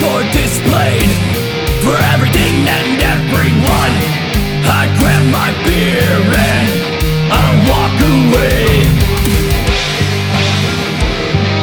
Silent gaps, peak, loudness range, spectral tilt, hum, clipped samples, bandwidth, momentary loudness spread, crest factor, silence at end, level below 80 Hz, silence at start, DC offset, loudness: none; 0 dBFS; 1 LU; -5 dB/octave; none; under 0.1%; over 20 kHz; 4 LU; 10 dB; 0 s; -20 dBFS; 0 s; under 0.1%; -11 LUFS